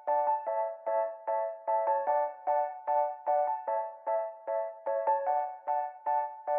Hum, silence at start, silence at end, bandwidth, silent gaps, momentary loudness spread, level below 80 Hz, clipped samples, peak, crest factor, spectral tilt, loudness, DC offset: none; 0 s; 0 s; 2.8 kHz; none; 5 LU; under -90 dBFS; under 0.1%; -18 dBFS; 14 dB; -1.5 dB/octave; -32 LUFS; under 0.1%